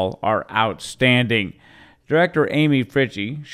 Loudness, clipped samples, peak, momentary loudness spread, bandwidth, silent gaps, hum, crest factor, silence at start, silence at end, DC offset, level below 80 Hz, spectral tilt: -19 LUFS; under 0.1%; -2 dBFS; 6 LU; 14.5 kHz; none; none; 18 dB; 0 s; 0 s; under 0.1%; -54 dBFS; -6 dB/octave